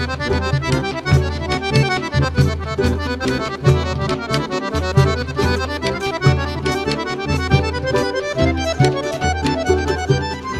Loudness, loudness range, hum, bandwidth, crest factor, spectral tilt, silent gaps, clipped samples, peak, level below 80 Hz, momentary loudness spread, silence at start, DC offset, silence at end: -19 LUFS; 1 LU; none; 13 kHz; 18 dB; -6 dB/octave; none; under 0.1%; 0 dBFS; -30 dBFS; 4 LU; 0 s; under 0.1%; 0 s